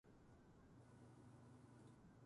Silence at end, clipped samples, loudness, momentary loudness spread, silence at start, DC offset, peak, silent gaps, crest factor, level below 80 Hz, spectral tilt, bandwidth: 0 s; under 0.1%; -67 LUFS; 4 LU; 0.05 s; under 0.1%; -52 dBFS; none; 14 dB; -78 dBFS; -7 dB/octave; 11 kHz